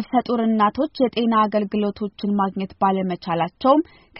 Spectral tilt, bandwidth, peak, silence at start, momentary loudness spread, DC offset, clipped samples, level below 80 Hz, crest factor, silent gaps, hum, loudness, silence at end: -5.5 dB/octave; 5.8 kHz; -4 dBFS; 0 s; 6 LU; under 0.1%; under 0.1%; -58 dBFS; 16 dB; none; none; -21 LUFS; 0 s